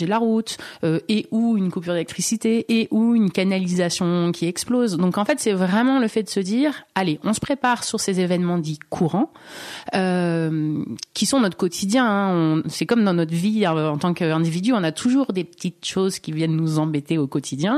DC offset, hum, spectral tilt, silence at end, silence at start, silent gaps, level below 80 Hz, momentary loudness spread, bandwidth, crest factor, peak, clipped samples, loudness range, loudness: under 0.1%; none; -5.5 dB/octave; 0 s; 0 s; none; -62 dBFS; 6 LU; 13.5 kHz; 18 dB; -4 dBFS; under 0.1%; 3 LU; -21 LUFS